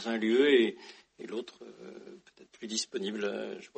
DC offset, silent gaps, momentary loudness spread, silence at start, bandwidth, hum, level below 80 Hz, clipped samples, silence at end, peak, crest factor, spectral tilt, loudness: under 0.1%; none; 25 LU; 0 s; 8.4 kHz; none; -80 dBFS; under 0.1%; 0.1 s; -14 dBFS; 20 dB; -3.5 dB/octave; -30 LUFS